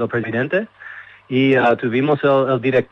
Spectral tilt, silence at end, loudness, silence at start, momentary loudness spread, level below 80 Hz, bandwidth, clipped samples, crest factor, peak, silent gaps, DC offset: -8.5 dB/octave; 0.05 s; -17 LUFS; 0 s; 19 LU; -62 dBFS; 6.4 kHz; under 0.1%; 14 dB; -4 dBFS; none; under 0.1%